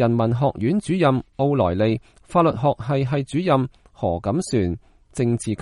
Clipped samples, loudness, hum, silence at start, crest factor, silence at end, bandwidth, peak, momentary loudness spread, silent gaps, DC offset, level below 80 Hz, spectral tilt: under 0.1%; -22 LUFS; none; 0 s; 16 dB; 0 s; 11.5 kHz; -6 dBFS; 7 LU; none; under 0.1%; -46 dBFS; -7.5 dB/octave